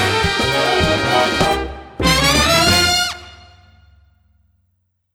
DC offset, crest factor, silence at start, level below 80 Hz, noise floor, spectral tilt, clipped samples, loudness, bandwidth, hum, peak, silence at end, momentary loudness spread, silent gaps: under 0.1%; 18 dB; 0 s; -32 dBFS; -66 dBFS; -3 dB/octave; under 0.1%; -14 LUFS; 18.5 kHz; none; 0 dBFS; 1.8 s; 10 LU; none